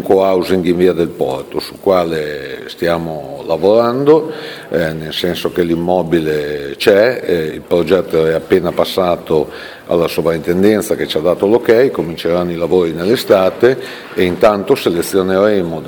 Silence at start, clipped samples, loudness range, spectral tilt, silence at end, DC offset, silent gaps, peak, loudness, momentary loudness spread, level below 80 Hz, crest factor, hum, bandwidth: 0 s; under 0.1%; 2 LU; -6 dB/octave; 0 s; under 0.1%; none; 0 dBFS; -14 LUFS; 9 LU; -46 dBFS; 14 dB; none; over 20 kHz